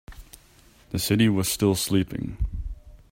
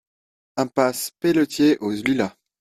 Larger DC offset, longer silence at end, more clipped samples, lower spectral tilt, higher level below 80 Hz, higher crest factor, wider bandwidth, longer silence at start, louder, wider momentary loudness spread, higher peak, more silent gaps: neither; second, 0.15 s vs 0.3 s; neither; about the same, -5 dB/octave vs -5 dB/octave; first, -38 dBFS vs -60 dBFS; about the same, 18 dB vs 18 dB; about the same, 16.5 kHz vs 15 kHz; second, 0.1 s vs 0.55 s; second, -24 LUFS vs -21 LUFS; first, 16 LU vs 8 LU; second, -8 dBFS vs -4 dBFS; neither